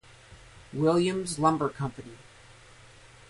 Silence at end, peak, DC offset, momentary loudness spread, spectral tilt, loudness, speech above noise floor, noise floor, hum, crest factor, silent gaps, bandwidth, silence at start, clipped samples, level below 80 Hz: 1.15 s; -10 dBFS; under 0.1%; 18 LU; -6 dB/octave; -27 LUFS; 26 dB; -53 dBFS; none; 20 dB; none; 11.5 kHz; 0.3 s; under 0.1%; -60 dBFS